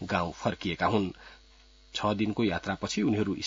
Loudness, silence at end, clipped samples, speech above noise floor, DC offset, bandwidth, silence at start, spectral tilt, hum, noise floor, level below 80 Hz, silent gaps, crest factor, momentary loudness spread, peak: -30 LUFS; 0 s; under 0.1%; 28 dB; under 0.1%; 7.8 kHz; 0 s; -5.5 dB/octave; none; -57 dBFS; -56 dBFS; none; 20 dB; 6 LU; -10 dBFS